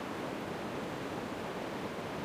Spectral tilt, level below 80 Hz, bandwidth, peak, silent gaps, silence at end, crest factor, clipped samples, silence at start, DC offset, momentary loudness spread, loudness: -5.5 dB/octave; -64 dBFS; 15.5 kHz; -26 dBFS; none; 0 s; 12 dB; under 0.1%; 0 s; under 0.1%; 0 LU; -39 LUFS